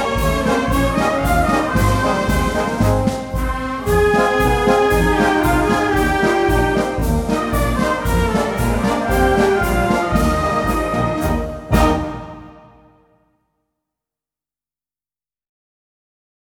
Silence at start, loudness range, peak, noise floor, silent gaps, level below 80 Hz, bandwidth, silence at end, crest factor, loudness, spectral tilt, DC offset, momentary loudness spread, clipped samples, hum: 0 s; 6 LU; 0 dBFS; under -90 dBFS; none; -26 dBFS; 19 kHz; 3.85 s; 16 dB; -17 LUFS; -6 dB/octave; under 0.1%; 5 LU; under 0.1%; none